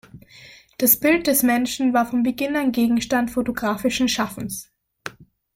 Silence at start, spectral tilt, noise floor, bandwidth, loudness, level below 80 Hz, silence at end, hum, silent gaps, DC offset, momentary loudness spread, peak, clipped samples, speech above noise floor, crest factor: 0.15 s; -3.5 dB/octave; -47 dBFS; 16.5 kHz; -20 LUFS; -52 dBFS; 0.3 s; none; none; under 0.1%; 19 LU; -2 dBFS; under 0.1%; 27 dB; 20 dB